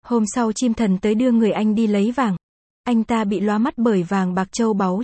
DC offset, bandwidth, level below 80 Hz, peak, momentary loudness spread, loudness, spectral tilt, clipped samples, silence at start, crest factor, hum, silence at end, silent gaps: under 0.1%; 8.8 kHz; -52 dBFS; -6 dBFS; 5 LU; -19 LUFS; -6 dB/octave; under 0.1%; 0.05 s; 12 dB; none; 0 s; 2.43-2.84 s